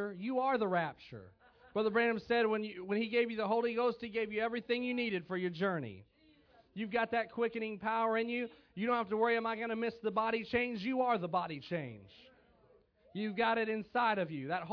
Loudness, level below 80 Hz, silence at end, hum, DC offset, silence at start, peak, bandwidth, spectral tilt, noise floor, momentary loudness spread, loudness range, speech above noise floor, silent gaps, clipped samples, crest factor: -35 LUFS; -72 dBFS; 0 s; none; under 0.1%; 0 s; -20 dBFS; 5.4 kHz; -3.5 dB/octave; -67 dBFS; 9 LU; 3 LU; 33 dB; none; under 0.1%; 16 dB